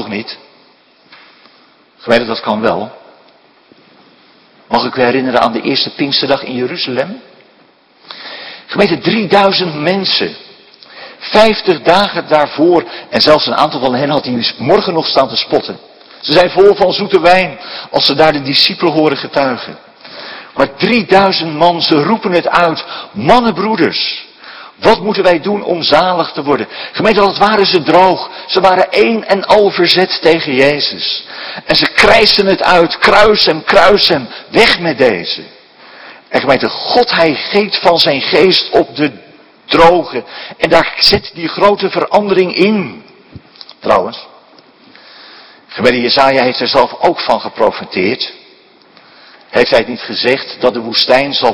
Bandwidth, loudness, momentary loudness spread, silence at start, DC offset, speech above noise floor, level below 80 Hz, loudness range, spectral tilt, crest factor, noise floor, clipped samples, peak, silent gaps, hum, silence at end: 11 kHz; -11 LUFS; 13 LU; 0 s; under 0.1%; 37 dB; -44 dBFS; 7 LU; -5 dB/octave; 12 dB; -47 dBFS; 1%; 0 dBFS; none; none; 0 s